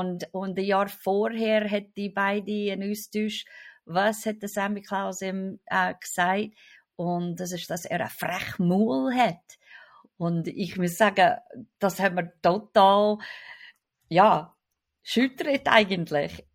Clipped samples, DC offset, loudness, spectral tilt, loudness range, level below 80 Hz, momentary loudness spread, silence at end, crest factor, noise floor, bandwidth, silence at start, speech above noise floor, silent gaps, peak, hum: under 0.1%; under 0.1%; -26 LUFS; -5 dB/octave; 5 LU; -66 dBFS; 12 LU; 0.15 s; 22 dB; -80 dBFS; 16.5 kHz; 0 s; 54 dB; none; -4 dBFS; none